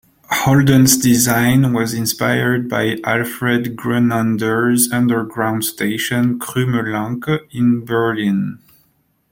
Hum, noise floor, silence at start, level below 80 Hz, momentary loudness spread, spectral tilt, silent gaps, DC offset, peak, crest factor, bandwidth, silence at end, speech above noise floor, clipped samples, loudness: none; -61 dBFS; 0.3 s; -50 dBFS; 8 LU; -4.5 dB/octave; none; under 0.1%; 0 dBFS; 16 dB; 16.5 kHz; 0.75 s; 45 dB; under 0.1%; -16 LUFS